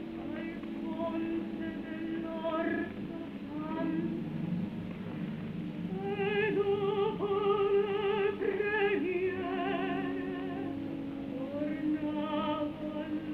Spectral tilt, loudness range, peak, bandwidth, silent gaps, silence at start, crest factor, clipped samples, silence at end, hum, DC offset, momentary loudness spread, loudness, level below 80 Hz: -8.5 dB/octave; 6 LU; -18 dBFS; 5.6 kHz; none; 0 s; 14 dB; under 0.1%; 0 s; none; under 0.1%; 9 LU; -34 LUFS; -62 dBFS